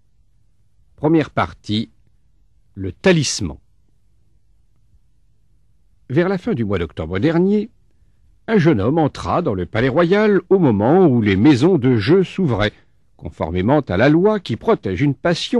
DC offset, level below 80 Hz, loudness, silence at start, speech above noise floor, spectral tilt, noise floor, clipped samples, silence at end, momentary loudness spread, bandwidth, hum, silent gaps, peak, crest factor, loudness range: 0.2%; -44 dBFS; -17 LUFS; 1 s; 44 dB; -6.5 dB/octave; -60 dBFS; under 0.1%; 0 s; 10 LU; 11 kHz; none; none; -2 dBFS; 16 dB; 9 LU